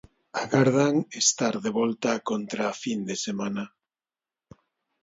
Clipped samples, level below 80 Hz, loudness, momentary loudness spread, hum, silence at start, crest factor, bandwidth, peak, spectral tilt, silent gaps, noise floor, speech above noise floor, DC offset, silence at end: under 0.1%; -68 dBFS; -26 LUFS; 11 LU; none; 0.35 s; 20 dB; 8 kHz; -8 dBFS; -4 dB/octave; none; under -90 dBFS; over 64 dB; under 0.1%; 1.35 s